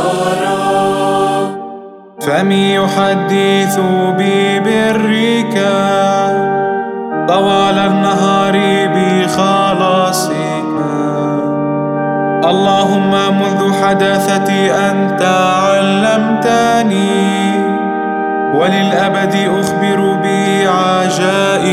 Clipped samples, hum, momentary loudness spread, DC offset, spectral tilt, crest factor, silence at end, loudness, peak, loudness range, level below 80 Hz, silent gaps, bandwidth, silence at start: under 0.1%; none; 5 LU; under 0.1%; -5 dB/octave; 12 dB; 0 s; -12 LUFS; 0 dBFS; 2 LU; -52 dBFS; none; 15.5 kHz; 0 s